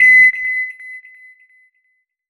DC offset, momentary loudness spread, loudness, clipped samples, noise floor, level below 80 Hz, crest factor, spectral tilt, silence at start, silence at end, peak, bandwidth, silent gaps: under 0.1%; 26 LU; -11 LUFS; under 0.1%; -66 dBFS; -56 dBFS; 14 dB; -0.5 dB/octave; 0 s; 1.3 s; -2 dBFS; 10.5 kHz; none